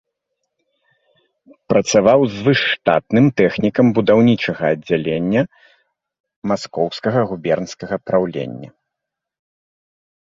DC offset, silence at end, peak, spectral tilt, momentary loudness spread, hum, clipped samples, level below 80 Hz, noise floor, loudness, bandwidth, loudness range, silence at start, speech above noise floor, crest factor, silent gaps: under 0.1%; 1.7 s; -2 dBFS; -6 dB/octave; 11 LU; none; under 0.1%; -54 dBFS; -82 dBFS; -17 LUFS; 8 kHz; 7 LU; 1.7 s; 66 dB; 18 dB; 6.20-6.24 s, 6.36-6.42 s